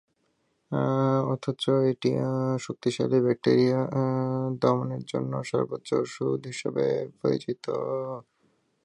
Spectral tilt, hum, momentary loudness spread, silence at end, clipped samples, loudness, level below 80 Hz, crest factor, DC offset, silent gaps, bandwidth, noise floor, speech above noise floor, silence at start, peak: -7 dB/octave; none; 8 LU; 0.65 s; under 0.1%; -27 LUFS; -68 dBFS; 18 dB; under 0.1%; none; 11 kHz; -72 dBFS; 46 dB; 0.7 s; -8 dBFS